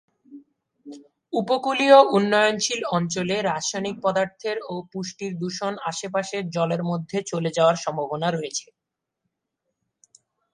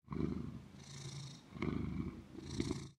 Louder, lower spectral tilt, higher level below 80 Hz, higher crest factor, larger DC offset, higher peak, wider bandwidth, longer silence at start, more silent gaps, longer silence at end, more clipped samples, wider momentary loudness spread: first, -23 LUFS vs -45 LUFS; second, -4 dB/octave vs -6 dB/octave; second, -68 dBFS vs -58 dBFS; about the same, 22 dB vs 20 dB; neither; first, -2 dBFS vs -24 dBFS; second, 11 kHz vs 13 kHz; first, 0.3 s vs 0.05 s; neither; first, 1.9 s vs 0.05 s; neither; first, 13 LU vs 10 LU